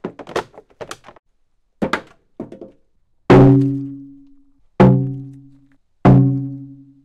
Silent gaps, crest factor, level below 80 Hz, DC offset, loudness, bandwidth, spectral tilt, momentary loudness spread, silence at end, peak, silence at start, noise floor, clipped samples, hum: 1.19-1.23 s; 16 dB; -38 dBFS; under 0.1%; -15 LUFS; 7.6 kHz; -9 dB/octave; 26 LU; 0.35 s; -2 dBFS; 0.05 s; -61 dBFS; under 0.1%; none